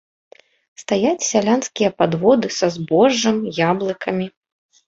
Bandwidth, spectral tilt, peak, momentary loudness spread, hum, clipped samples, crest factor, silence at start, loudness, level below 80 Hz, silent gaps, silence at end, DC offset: 7.8 kHz; -4.5 dB/octave; -2 dBFS; 8 LU; none; under 0.1%; 18 dB; 0.8 s; -18 LUFS; -60 dBFS; none; 0.6 s; under 0.1%